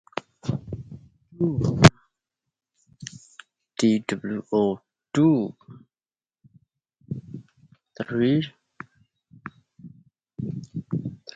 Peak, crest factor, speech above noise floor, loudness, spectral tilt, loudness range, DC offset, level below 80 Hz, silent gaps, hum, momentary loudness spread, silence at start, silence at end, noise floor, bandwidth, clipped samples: 0 dBFS; 26 dB; over 69 dB; -24 LUFS; -6.5 dB/octave; 7 LU; under 0.1%; -50 dBFS; none; none; 24 LU; 0.15 s; 0.2 s; under -90 dBFS; 11 kHz; under 0.1%